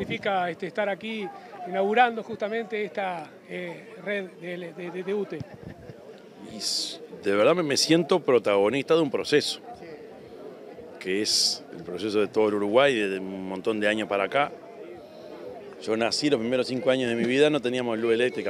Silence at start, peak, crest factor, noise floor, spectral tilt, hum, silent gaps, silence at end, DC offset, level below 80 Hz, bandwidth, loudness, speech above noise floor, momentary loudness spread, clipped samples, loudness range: 0 s; -6 dBFS; 20 dB; -46 dBFS; -3.5 dB/octave; none; none; 0 s; under 0.1%; -70 dBFS; 15.5 kHz; -25 LUFS; 21 dB; 21 LU; under 0.1%; 9 LU